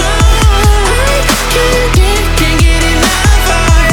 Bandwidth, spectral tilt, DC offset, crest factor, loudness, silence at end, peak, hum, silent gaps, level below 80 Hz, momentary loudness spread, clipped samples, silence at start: 19 kHz; -4 dB/octave; under 0.1%; 8 dB; -9 LUFS; 0 s; 0 dBFS; none; none; -10 dBFS; 2 LU; 0.5%; 0 s